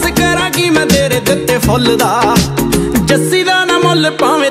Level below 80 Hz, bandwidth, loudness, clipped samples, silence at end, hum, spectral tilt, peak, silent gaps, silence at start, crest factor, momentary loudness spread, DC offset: -30 dBFS; 16.5 kHz; -11 LUFS; under 0.1%; 0 s; none; -4 dB/octave; 0 dBFS; none; 0 s; 10 dB; 3 LU; under 0.1%